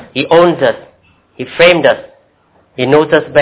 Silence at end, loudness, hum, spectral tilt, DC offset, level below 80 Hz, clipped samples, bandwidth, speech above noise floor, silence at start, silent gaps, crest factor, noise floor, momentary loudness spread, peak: 0 s; -10 LUFS; none; -9.5 dB/octave; under 0.1%; -48 dBFS; 0.4%; 4 kHz; 42 dB; 0 s; none; 12 dB; -52 dBFS; 19 LU; 0 dBFS